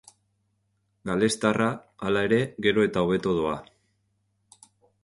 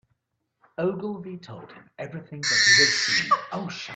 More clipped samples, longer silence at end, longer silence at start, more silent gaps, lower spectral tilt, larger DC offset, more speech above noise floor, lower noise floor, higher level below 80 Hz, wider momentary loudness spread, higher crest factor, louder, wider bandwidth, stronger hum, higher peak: neither; first, 1.4 s vs 0 s; first, 1.05 s vs 0.8 s; neither; first, -5.5 dB/octave vs -1.5 dB/octave; neither; second, 48 dB vs 52 dB; second, -73 dBFS vs -77 dBFS; first, -56 dBFS vs -68 dBFS; second, 8 LU vs 23 LU; about the same, 20 dB vs 22 dB; second, -25 LUFS vs -21 LUFS; first, 11.5 kHz vs 9.2 kHz; neither; about the same, -6 dBFS vs -4 dBFS